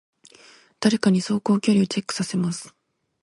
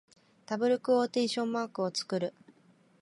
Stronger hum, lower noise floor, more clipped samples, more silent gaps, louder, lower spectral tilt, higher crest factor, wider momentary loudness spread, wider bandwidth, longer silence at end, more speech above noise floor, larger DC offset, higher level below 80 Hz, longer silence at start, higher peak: neither; second, -52 dBFS vs -64 dBFS; neither; neither; first, -22 LUFS vs -31 LUFS; about the same, -5.5 dB/octave vs -4.5 dB/octave; about the same, 20 dB vs 16 dB; about the same, 7 LU vs 7 LU; about the same, 11.5 kHz vs 11.5 kHz; second, 0.55 s vs 0.7 s; about the same, 31 dB vs 34 dB; neither; first, -64 dBFS vs -82 dBFS; first, 0.8 s vs 0.5 s; first, -4 dBFS vs -16 dBFS